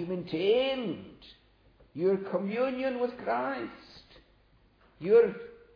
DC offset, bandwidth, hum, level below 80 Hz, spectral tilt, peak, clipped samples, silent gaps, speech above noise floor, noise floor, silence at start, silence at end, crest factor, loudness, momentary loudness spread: under 0.1%; 5.2 kHz; none; -66 dBFS; -8 dB/octave; -12 dBFS; under 0.1%; none; 34 dB; -64 dBFS; 0 s; 0.2 s; 18 dB; -29 LUFS; 19 LU